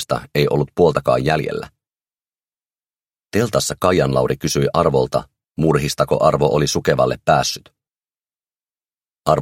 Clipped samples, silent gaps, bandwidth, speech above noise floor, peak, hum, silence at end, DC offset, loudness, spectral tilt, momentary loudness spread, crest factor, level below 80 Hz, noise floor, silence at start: under 0.1%; 8.56-8.60 s; 16.5 kHz; over 73 dB; 0 dBFS; none; 0 s; under 0.1%; -18 LUFS; -5 dB/octave; 9 LU; 18 dB; -42 dBFS; under -90 dBFS; 0 s